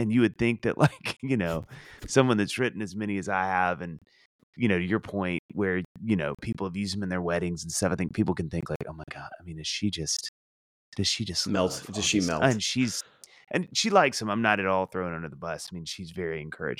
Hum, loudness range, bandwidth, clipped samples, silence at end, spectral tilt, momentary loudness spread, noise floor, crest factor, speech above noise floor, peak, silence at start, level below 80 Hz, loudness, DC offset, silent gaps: none; 5 LU; 15.5 kHz; under 0.1%; 0.05 s; -4.5 dB/octave; 12 LU; under -90 dBFS; 22 dB; over 62 dB; -6 dBFS; 0 s; -56 dBFS; -28 LUFS; under 0.1%; 4.26-4.53 s, 5.39-5.49 s, 5.85-5.95 s, 8.76-8.80 s, 10.29-10.92 s